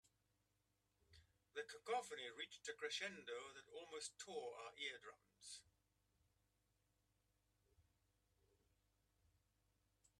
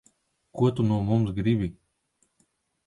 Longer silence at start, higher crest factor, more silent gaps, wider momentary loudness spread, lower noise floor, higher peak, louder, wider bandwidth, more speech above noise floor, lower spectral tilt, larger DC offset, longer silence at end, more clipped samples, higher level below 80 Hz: first, 1.1 s vs 0.55 s; about the same, 22 dB vs 18 dB; neither; first, 12 LU vs 8 LU; first, -86 dBFS vs -72 dBFS; second, -34 dBFS vs -10 dBFS; second, -51 LUFS vs -26 LUFS; first, 13 kHz vs 10.5 kHz; second, 34 dB vs 48 dB; second, -1 dB/octave vs -9 dB/octave; neither; first, 2.4 s vs 1.15 s; neither; second, -88 dBFS vs -50 dBFS